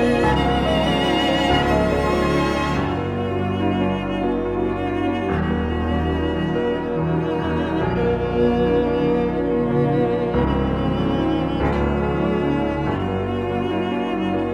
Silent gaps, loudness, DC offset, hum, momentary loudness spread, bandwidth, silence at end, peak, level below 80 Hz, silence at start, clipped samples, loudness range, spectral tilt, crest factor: none; -21 LUFS; under 0.1%; none; 4 LU; 14 kHz; 0 s; -6 dBFS; -32 dBFS; 0 s; under 0.1%; 2 LU; -7 dB/octave; 14 dB